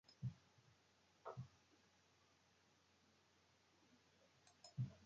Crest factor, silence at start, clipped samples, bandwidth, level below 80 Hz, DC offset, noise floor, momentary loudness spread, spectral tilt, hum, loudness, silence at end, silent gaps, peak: 22 dB; 0.1 s; under 0.1%; 7.2 kHz; -80 dBFS; under 0.1%; -77 dBFS; 14 LU; -7 dB/octave; none; -55 LUFS; 0 s; none; -36 dBFS